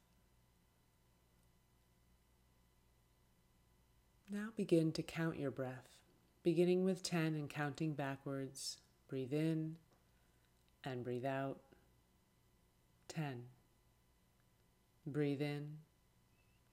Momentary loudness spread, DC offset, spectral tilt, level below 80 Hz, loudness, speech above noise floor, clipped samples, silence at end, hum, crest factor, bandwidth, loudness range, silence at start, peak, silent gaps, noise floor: 17 LU; under 0.1%; -6 dB/octave; -76 dBFS; -41 LUFS; 34 dB; under 0.1%; 0.9 s; none; 22 dB; 16 kHz; 12 LU; 4.3 s; -22 dBFS; none; -75 dBFS